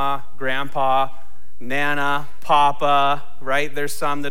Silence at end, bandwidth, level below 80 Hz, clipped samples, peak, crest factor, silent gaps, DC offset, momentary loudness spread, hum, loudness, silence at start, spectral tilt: 0 s; 17 kHz; -52 dBFS; under 0.1%; -4 dBFS; 16 dB; none; 10%; 9 LU; none; -21 LUFS; 0 s; -4 dB/octave